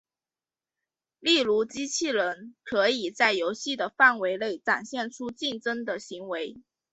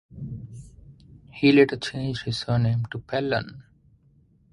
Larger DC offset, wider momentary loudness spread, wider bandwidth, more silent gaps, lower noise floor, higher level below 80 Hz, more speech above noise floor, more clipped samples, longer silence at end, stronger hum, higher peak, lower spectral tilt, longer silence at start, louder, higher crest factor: neither; second, 14 LU vs 23 LU; second, 8.2 kHz vs 11.5 kHz; neither; first, under -90 dBFS vs -60 dBFS; second, -72 dBFS vs -52 dBFS; first, over 63 dB vs 37 dB; neither; second, 0.3 s vs 0.9 s; neither; about the same, -6 dBFS vs -4 dBFS; second, -2 dB/octave vs -7 dB/octave; first, 1.2 s vs 0.15 s; about the same, -26 LUFS vs -24 LUFS; about the same, 22 dB vs 22 dB